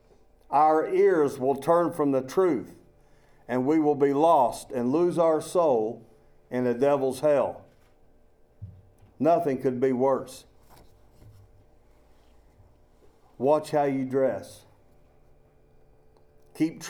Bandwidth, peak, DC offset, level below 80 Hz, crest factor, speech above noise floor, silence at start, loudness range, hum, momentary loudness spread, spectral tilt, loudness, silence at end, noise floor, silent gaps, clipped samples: 18.5 kHz; -8 dBFS; under 0.1%; -62 dBFS; 18 dB; 34 dB; 0.5 s; 7 LU; none; 10 LU; -6.5 dB/octave; -25 LUFS; 0 s; -58 dBFS; none; under 0.1%